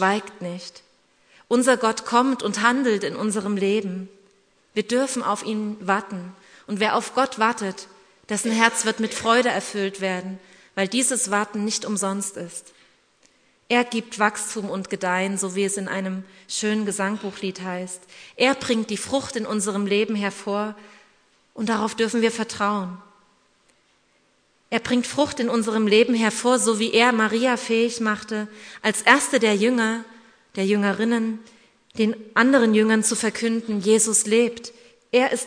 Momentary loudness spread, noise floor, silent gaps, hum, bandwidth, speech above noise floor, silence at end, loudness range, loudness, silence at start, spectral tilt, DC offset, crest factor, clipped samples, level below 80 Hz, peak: 14 LU; -63 dBFS; none; none; 11 kHz; 41 dB; 0 s; 6 LU; -22 LUFS; 0 s; -3.5 dB/octave; under 0.1%; 24 dB; under 0.1%; -68 dBFS; 0 dBFS